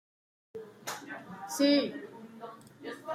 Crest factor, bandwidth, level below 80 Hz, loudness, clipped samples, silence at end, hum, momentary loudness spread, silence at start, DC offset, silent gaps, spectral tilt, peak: 20 dB; 16 kHz; -82 dBFS; -32 LUFS; under 0.1%; 0 s; none; 22 LU; 0.55 s; under 0.1%; none; -3.5 dB/octave; -14 dBFS